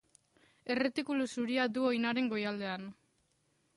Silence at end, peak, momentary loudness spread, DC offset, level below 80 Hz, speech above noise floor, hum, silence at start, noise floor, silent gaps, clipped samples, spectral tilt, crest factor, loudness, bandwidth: 0.85 s; -20 dBFS; 10 LU; under 0.1%; -78 dBFS; 42 dB; none; 0.65 s; -75 dBFS; none; under 0.1%; -5 dB/octave; 16 dB; -34 LUFS; 11.5 kHz